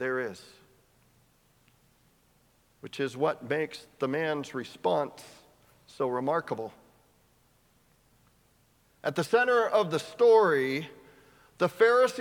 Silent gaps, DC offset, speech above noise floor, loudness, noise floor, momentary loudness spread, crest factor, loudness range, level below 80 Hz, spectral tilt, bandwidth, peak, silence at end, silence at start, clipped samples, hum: none; under 0.1%; 39 dB; -28 LUFS; -66 dBFS; 16 LU; 20 dB; 10 LU; -74 dBFS; -5 dB/octave; 16.5 kHz; -10 dBFS; 0 s; 0 s; under 0.1%; none